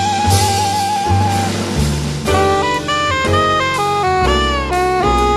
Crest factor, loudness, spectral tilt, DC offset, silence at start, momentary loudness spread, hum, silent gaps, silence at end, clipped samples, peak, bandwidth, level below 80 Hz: 14 dB; -15 LUFS; -4.5 dB/octave; under 0.1%; 0 s; 4 LU; none; none; 0 s; under 0.1%; 0 dBFS; 14 kHz; -26 dBFS